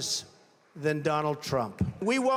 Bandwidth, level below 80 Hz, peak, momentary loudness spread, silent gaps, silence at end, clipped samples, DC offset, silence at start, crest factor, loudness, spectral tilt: 17.5 kHz; -56 dBFS; -14 dBFS; 5 LU; none; 0 s; under 0.1%; under 0.1%; 0 s; 16 dB; -30 LUFS; -4.5 dB/octave